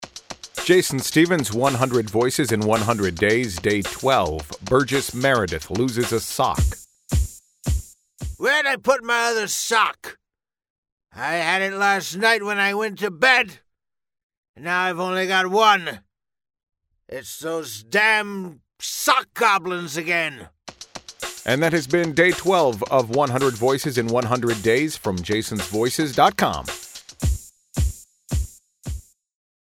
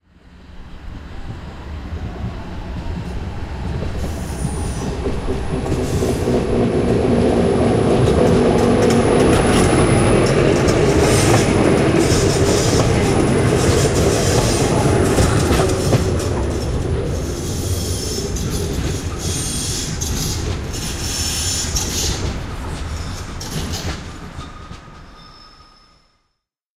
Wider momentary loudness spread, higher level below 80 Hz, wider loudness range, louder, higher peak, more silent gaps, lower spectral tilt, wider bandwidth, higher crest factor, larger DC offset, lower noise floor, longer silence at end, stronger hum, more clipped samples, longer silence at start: about the same, 16 LU vs 15 LU; second, -36 dBFS vs -28 dBFS; second, 3 LU vs 14 LU; second, -21 LUFS vs -17 LUFS; about the same, -2 dBFS vs -2 dBFS; first, 10.70-10.83 s, 10.92-10.97 s, 14.23-14.30 s, 14.37-14.43 s, 14.49-14.54 s vs none; about the same, -4 dB/octave vs -5 dB/octave; about the same, 17 kHz vs 16 kHz; about the same, 20 dB vs 16 dB; neither; first, -78 dBFS vs -73 dBFS; second, 0.75 s vs 1.35 s; neither; neither; second, 0 s vs 0.3 s